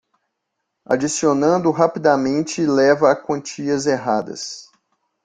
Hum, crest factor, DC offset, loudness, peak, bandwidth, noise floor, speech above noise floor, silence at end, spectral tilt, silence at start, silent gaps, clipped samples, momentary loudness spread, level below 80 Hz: none; 18 dB; under 0.1%; -18 LUFS; -2 dBFS; 9.4 kHz; -77 dBFS; 59 dB; 0.6 s; -5 dB/octave; 0.9 s; none; under 0.1%; 10 LU; -60 dBFS